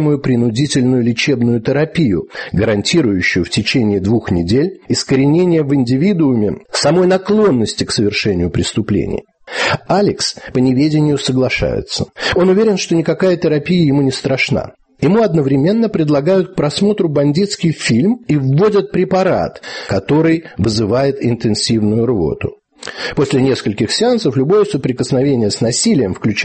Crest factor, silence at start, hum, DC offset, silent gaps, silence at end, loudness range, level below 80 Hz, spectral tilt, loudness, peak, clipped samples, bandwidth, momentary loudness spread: 12 dB; 0 s; none; under 0.1%; none; 0 s; 2 LU; -40 dBFS; -5.5 dB/octave; -14 LUFS; -2 dBFS; under 0.1%; 8.8 kHz; 5 LU